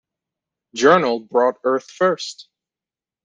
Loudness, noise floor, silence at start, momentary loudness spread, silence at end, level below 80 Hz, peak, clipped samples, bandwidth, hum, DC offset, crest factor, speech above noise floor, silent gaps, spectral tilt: -18 LUFS; under -90 dBFS; 0.75 s; 13 LU; 0.8 s; -66 dBFS; -2 dBFS; under 0.1%; 9.6 kHz; none; under 0.1%; 18 dB; over 72 dB; none; -4.5 dB/octave